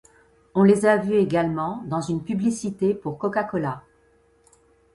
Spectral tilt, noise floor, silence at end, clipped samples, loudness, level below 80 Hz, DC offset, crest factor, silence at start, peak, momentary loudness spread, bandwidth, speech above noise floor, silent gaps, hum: -7 dB/octave; -60 dBFS; 1.15 s; under 0.1%; -23 LUFS; -58 dBFS; under 0.1%; 18 dB; 0.55 s; -6 dBFS; 10 LU; 11.5 kHz; 38 dB; none; none